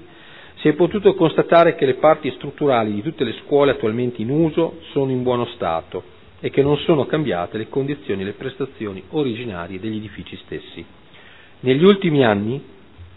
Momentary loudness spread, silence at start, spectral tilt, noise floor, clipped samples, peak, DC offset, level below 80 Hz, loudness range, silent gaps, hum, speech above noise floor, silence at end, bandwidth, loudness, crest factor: 16 LU; 0 s; -10 dB/octave; -46 dBFS; under 0.1%; 0 dBFS; 0.4%; -54 dBFS; 9 LU; none; none; 27 dB; 0.1 s; 5 kHz; -19 LUFS; 20 dB